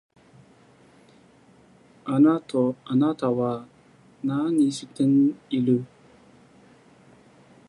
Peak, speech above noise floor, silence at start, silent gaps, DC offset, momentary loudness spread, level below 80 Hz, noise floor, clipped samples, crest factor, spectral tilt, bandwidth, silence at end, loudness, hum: -8 dBFS; 33 dB; 2.05 s; none; under 0.1%; 10 LU; -70 dBFS; -55 dBFS; under 0.1%; 16 dB; -7.5 dB/octave; 11 kHz; 1.85 s; -23 LUFS; none